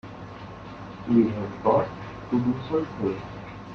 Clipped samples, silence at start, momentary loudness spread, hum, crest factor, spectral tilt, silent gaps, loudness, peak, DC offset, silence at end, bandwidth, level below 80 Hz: under 0.1%; 0.05 s; 18 LU; none; 18 dB; -9 dB/octave; none; -26 LUFS; -8 dBFS; under 0.1%; 0 s; 6.6 kHz; -54 dBFS